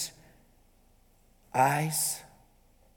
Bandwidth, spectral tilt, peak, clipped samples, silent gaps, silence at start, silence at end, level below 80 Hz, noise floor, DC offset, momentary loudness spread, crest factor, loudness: 19.5 kHz; -3.5 dB/octave; -12 dBFS; under 0.1%; none; 0 s; 0.7 s; -64 dBFS; -63 dBFS; under 0.1%; 12 LU; 22 dB; -29 LUFS